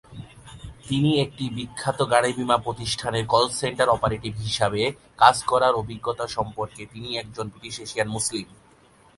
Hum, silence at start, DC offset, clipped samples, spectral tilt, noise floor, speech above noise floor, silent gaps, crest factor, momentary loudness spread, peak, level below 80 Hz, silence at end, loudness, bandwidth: none; 0.1 s; under 0.1%; under 0.1%; -4 dB/octave; -55 dBFS; 31 dB; none; 24 dB; 14 LU; 0 dBFS; -50 dBFS; 0.75 s; -24 LUFS; 11.5 kHz